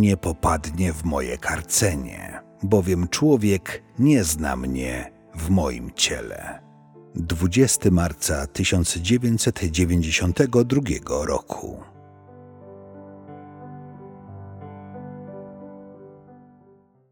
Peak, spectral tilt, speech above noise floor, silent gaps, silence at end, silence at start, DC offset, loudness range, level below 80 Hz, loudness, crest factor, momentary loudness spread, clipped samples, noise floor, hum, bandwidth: -4 dBFS; -4.5 dB/octave; 34 dB; none; 0.75 s; 0 s; under 0.1%; 19 LU; -38 dBFS; -22 LUFS; 20 dB; 23 LU; under 0.1%; -55 dBFS; none; 17 kHz